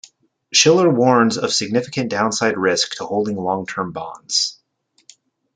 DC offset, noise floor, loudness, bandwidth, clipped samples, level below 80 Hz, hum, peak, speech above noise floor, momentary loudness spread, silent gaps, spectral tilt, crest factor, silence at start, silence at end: under 0.1%; -63 dBFS; -18 LUFS; 10 kHz; under 0.1%; -64 dBFS; none; -2 dBFS; 46 dB; 10 LU; none; -3.5 dB/octave; 18 dB; 0.5 s; 1.05 s